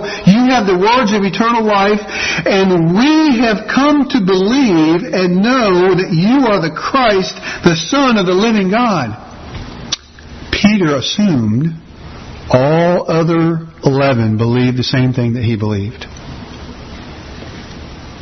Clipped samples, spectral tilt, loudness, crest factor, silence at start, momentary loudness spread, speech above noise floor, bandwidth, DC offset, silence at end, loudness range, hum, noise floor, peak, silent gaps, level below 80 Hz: under 0.1%; -6 dB/octave; -12 LUFS; 12 dB; 0 s; 19 LU; 21 dB; 6.4 kHz; under 0.1%; 0 s; 5 LU; none; -33 dBFS; 0 dBFS; none; -38 dBFS